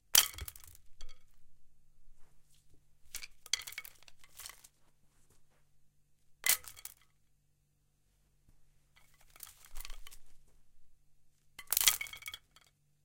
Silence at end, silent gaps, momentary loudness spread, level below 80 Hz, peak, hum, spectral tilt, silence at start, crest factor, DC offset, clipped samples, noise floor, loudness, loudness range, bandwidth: 0.65 s; none; 26 LU; -58 dBFS; -2 dBFS; none; 2 dB/octave; 0.15 s; 40 dB; under 0.1%; under 0.1%; -74 dBFS; -31 LUFS; 20 LU; 17 kHz